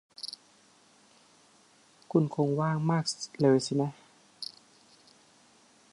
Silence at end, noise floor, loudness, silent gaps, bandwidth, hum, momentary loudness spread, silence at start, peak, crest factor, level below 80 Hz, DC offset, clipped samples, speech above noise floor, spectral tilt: 1.5 s; -62 dBFS; -30 LUFS; none; 11.5 kHz; none; 16 LU; 0.2 s; -10 dBFS; 22 dB; -74 dBFS; under 0.1%; under 0.1%; 34 dB; -6 dB/octave